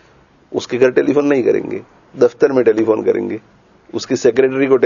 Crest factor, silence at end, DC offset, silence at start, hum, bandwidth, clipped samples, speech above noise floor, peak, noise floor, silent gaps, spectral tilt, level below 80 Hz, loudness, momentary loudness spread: 16 dB; 0 s; under 0.1%; 0.5 s; none; 7.4 kHz; under 0.1%; 35 dB; 0 dBFS; -49 dBFS; none; -6 dB/octave; -60 dBFS; -15 LUFS; 14 LU